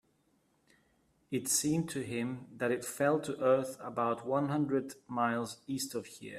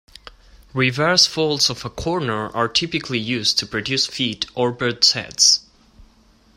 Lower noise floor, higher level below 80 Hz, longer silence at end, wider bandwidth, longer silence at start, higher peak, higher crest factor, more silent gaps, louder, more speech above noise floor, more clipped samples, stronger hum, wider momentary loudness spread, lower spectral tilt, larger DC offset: first, -73 dBFS vs -54 dBFS; second, -74 dBFS vs -48 dBFS; second, 0 s vs 0.55 s; about the same, 15.5 kHz vs 16 kHz; first, 1.3 s vs 0.25 s; second, -16 dBFS vs 0 dBFS; about the same, 18 dB vs 20 dB; neither; second, -34 LUFS vs -18 LUFS; first, 40 dB vs 34 dB; neither; neither; about the same, 9 LU vs 9 LU; first, -4.5 dB/octave vs -2.5 dB/octave; neither